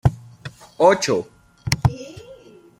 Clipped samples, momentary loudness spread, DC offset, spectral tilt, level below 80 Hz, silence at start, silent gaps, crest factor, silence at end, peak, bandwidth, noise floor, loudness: under 0.1%; 23 LU; under 0.1%; -5.5 dB/octave; -42 dBFS; 0.05 s; none; 22 dB; 0.45 s; 0 dBFS; 16 kHz; -45 dBFS; -20 LUFS